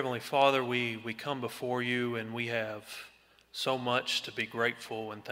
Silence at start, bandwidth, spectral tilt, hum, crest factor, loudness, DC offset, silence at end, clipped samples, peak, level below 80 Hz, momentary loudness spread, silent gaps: 0 s; 16 kHz; -4 dB/octave; none; 22 dB; -32 LUFS; under 0.1%; 0 s; under 0.1%; -12 dBFS; -76 dBFS; 13 LU; none